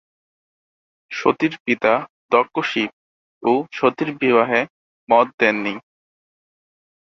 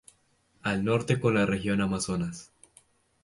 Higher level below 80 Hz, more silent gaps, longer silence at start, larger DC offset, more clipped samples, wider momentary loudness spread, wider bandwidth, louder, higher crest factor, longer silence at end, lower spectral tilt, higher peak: second, -64 dBFS vs -54 dBFS; first, 1.60-1.65 s, 2.10-2.29 s, 2.93-3.41 s, 4.70-5.07 s, 5.34-5.38 s vs none; first, 1.1 s vs 0.65 s; neither; neither; about the same, 9 LU vs 10 LU; second, 7.4 kHz vs 11.5 kHz; first, -19 LUFS vs -28 LUFS; about the same, 20 dB vs 18 dB; first, 1.4 s vs 0.8 s; about the same, -5.5 dB/octave vs -5.5 dB/octave; first, -2 dBFS vs -10 dBFS